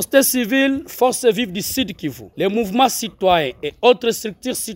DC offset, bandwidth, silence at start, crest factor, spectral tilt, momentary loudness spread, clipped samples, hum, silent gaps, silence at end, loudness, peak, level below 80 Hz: under 0.1%; 16.5 kHz; 0 s; 18 dB; -3 dB/octave; 9 LU; under 0.1%; none; none; 0 s; -18 LUFS; 0 dBFS; -50 dBFS